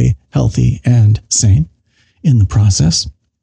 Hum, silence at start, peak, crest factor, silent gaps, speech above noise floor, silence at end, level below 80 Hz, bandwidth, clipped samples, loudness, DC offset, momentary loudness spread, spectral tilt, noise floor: none; 0 s; -2 dBFS; 10 dB; none; 45 dB; 0.3 s; -28 dBFS; 9.8 kHz; under 0.1%; -12 LUFS; under 0.1%; 6 LU; -5 dB/octave; -55 dBFS